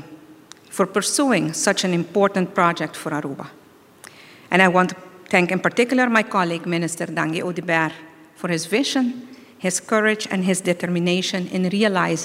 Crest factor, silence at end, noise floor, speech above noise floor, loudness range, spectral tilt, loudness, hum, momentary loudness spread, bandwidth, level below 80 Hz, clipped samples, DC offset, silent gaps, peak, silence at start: 22 dB; 0 s; -46 dBFS; 26 dB; 3 LU; -4 dB/octave; -20 LUFS; none; 9 LU; 16 kHz; -68 dBFS; under 0.1%; under 0.1%; none; 0 dBFS; 0 s